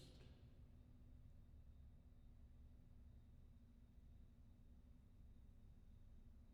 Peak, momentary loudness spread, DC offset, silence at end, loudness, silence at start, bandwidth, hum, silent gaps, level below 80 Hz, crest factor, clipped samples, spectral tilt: -50 dBFS; 3 LU; under 0.1%; 0 s; -68 LUFS; 0 s; 5.2 kHz; none; none; -66 dBFS; 14 dB; under 0.1%; -7 dB/octave